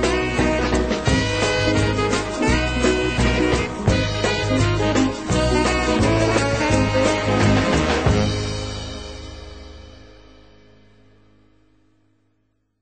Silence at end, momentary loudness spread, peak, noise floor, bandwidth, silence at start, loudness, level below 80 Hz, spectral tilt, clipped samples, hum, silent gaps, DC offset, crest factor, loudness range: 2.85 s; 11 LU; -2 dBFS; -68 dBFS; 9 kHz; 0 s; -19 LUFS; -30 dBFS; -5 dB/octave; under 0.1%; none; none; 0.2%; 18 dB; 9 LU